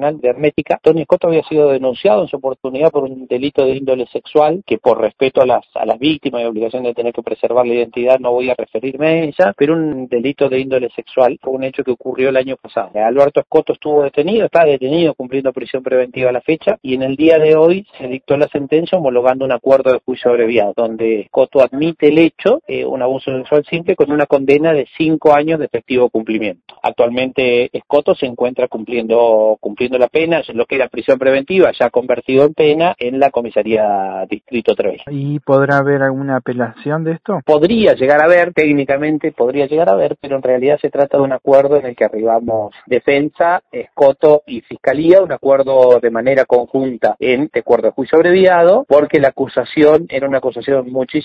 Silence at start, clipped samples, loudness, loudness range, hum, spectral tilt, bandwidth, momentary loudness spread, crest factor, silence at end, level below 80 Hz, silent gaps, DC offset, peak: 0 s; under 0.1%; -14 LUFS; 4 LU; none; -8 dB/octave; 6 kHz; 9 LU; 14 dB; 0 s; -54 dBFS; none; under 0.1%; 0 dBFS